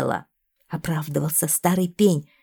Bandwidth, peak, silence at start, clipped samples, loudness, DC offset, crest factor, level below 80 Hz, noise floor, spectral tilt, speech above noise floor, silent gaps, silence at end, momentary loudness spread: 19.5 kHz; -6 dBFS; 0 s; under 0.1%; -22 LUFS; under 0.1%; 18 dB; -56 dBFS; -56 dBFS; -5 dB/octave; 34 dB; none; 0.2 s; 11 LU